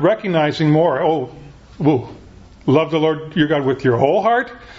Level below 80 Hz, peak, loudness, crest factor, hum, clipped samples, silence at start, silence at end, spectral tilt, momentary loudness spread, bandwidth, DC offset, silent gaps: -48 dBFS; 0 dBFS; -17 LUFS; 16 dB; none; under 0.1%; 0 s; 0 s; -8 dB/octave; 7 LU; 7.6 kHz; under 0.1%; none